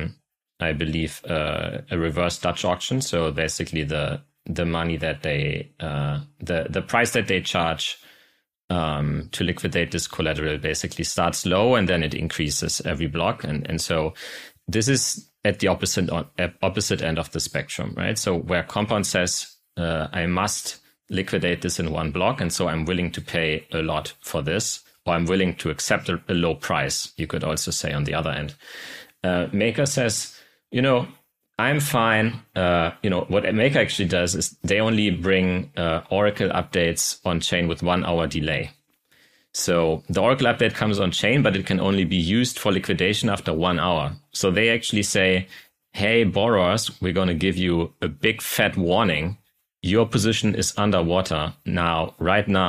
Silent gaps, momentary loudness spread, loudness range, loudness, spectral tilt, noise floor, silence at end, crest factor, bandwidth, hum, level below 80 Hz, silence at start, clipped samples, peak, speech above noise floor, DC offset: 8.63-8.68 s; 8 LU; 4 LU; -23 LUFS; -4.5 dB/octave; -61 dBFS; 0 s; 18 dB; 15.5 kHz; none; -44 dBFS; 0 s; under 0.1%; -6 dBFS; 38 dB; under 0.1%